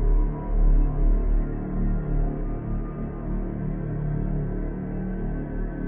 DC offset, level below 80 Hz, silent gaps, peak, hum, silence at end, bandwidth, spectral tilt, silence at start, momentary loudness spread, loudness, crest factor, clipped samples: under 0.1%; -24 dBFS; none; -10 dBFS; none; 0 s; 2.4 kHz; -13.5 dB/octave; 0 s; 6 LU; -29 LUFS; 14 dB; under 0.1%